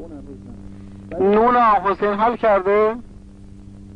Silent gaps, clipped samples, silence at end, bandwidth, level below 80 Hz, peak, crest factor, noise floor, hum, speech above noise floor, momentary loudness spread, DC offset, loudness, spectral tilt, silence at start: none; under 0.1%; 0.05 s; 6 kHz; -44 dBFS; -6 dBFS; 14 dB; -40 dBFS; none; 23 dB; 24 LU; under 0.1%; -17 LUFS; -8 dB/octave; 0 s